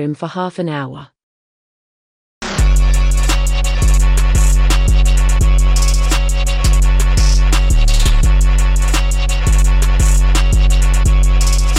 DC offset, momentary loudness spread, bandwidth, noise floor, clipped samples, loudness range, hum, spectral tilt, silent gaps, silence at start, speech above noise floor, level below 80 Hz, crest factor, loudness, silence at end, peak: under 0.1%; 7 LU; 14 kHz; under -90 dBFS; under 0.1%; 4 LU; none; -4.5 dB/octave; 1.23-2.41 s; 0 s; over 69 dB; -12 dBFS; 8 dB; -15 LUFS; 0 s; -2 dBFS